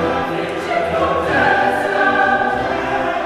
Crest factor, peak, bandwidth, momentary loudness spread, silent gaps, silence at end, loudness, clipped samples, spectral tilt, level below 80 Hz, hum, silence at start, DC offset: 14 dB; -2 dBFS; 14 kHz; 6 LU; none; 0 s; -16 LUFS; under 0.1%; -5.5 dB/octave; -42 dBFS; none; 0 s; under 0.1%